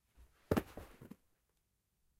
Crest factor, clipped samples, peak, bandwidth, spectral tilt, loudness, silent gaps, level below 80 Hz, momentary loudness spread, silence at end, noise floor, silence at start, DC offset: 26 dB; under 0.1%; -18 dBFS; 16 kHz; -6.5 dB/octave; -39 LUFS; none; -60 dBFS; 21 LU; 1.15 s; -82 dBFS; 0.2 s; under 0.1%